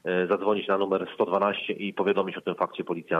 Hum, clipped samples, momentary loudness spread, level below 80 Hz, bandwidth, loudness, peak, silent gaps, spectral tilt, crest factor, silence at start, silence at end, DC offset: none; under 0.1%; 6 LU; -76 dBFS; 5.8 kHz; -27 LUFS; -10 dBFS; none; -7.5 dB/octave; 16 dB; 0.05 s; 0 s; under 0.1%